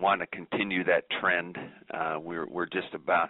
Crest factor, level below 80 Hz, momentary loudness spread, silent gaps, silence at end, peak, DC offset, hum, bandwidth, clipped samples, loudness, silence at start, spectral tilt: 18 dB; -70 dBFS; 10 LU; none; 0 s; -12 dBFS; under 0.1%; none; 4.1 kHz; under 0.1%; -30 LUFS; 0 s; -2 dB/octave